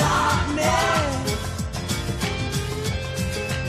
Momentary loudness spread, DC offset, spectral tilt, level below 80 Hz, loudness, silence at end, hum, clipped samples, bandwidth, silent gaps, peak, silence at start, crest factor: 7 LU; under 0.1%; -4.5 dB/octave; -34 dBFS; -24 LUFS; 0 s; none; under 0.1%; 15 kHz; none; -8 dBFS; 0 s; 14 dB